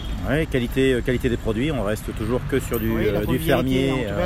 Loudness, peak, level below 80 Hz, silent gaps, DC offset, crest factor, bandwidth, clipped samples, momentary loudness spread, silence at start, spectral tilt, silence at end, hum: -22 LUFS; -6 dBFS; -32 dBFS; none; under 0.1%; 16 dB; 16 kHz; under 0.1%; 5 LU; 0 s; -6.5 dB/octave; 0 s; none